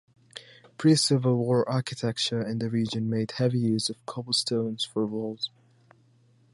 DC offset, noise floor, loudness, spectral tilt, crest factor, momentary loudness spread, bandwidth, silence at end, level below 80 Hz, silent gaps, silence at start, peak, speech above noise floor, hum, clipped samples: under 0.1%; -61 dBFS; -27 LUFS; -5 dB/octave; 18 dB; 12 LU; 11.5 kHz; 1.05 s; -68 dBFS; none; 0.35 s; -10 dBFS; 35 dB; none; under 0.1%